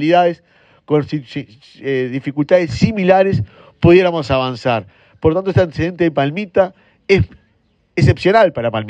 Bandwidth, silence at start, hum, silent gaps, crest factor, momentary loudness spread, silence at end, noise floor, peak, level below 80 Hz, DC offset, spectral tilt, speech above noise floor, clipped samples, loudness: 8.8 kHz; 0 s; none; none; 16 dB; 12 LU; 0 s; -59 dBFS; 0 dBFS; -40 dBFS; under 0.1%; -7.5 dB/octave; 44 dB; under 0.1%; -15 LUFS